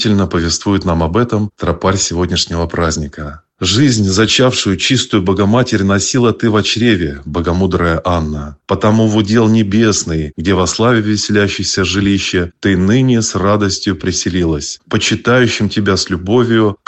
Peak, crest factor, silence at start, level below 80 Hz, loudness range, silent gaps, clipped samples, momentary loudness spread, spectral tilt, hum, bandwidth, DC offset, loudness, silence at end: 0 dBFS; 12 dB; 0 s; -34 dBFS; 2 LU; none; under 0.1%; 6 LU; -4.5 dB/octave; none; 8.4 kHz; under 0.1%; -13 LUFS; 0.1 s